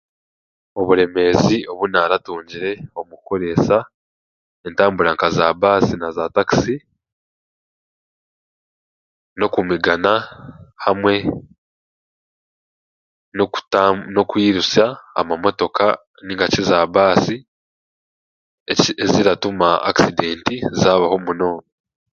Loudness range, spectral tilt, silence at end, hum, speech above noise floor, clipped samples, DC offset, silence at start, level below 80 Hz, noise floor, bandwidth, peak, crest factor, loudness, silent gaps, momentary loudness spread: 6 LU; -5 dB/octave; 0.5 s; none; over 73 dB; under 0.1%; under 0.1%; 0.75 s; -48 dBFS; under -90 dBFS; 7.4 kHz; 0 dBFS; 18 dB; -17 LUFS; 3.94-4.64 s, 7.12-9.36 s, 11.58-13.32 s, 16.07-16.14 s, 17.48-18.66 s; 11 LU